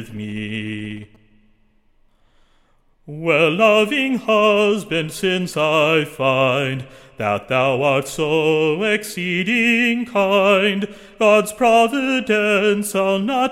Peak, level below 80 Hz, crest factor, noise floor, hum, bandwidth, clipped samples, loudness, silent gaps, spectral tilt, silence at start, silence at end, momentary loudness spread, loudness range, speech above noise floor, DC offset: -2 dBFS; -54 dBFS; 16 dB; -57 dBFS; none; 16.5 kHz; under 0.1%; -17 LUFS; none; -4.5 dB/octave; 0 s; 0 s; 12 LU; 4 LU; 39 dB; under 0.1%